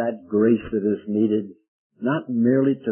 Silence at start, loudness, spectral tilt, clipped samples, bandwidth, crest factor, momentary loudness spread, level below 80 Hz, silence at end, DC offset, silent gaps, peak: 0 s; -22 LUFS; -12.5 dB/octave; under 0.1%; 3.3 kHz; 14 dB; 7 LU; -58 dBFS; 0 s; under 0.1%; 1.68-1.90 s; -8 dBFS